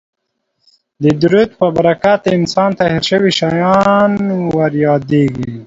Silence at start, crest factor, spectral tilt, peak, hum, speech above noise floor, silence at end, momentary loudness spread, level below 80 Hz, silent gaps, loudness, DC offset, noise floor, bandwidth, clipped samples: 1 s; 12 dB; -6.5 dB/octave; 0 dBFS; none; 56 dB; 0 s; 4 LU; -46 dBFS; none; -13 LUFS; under 0.1%; -69 dBFS; 7.8 kHz; under 0.1%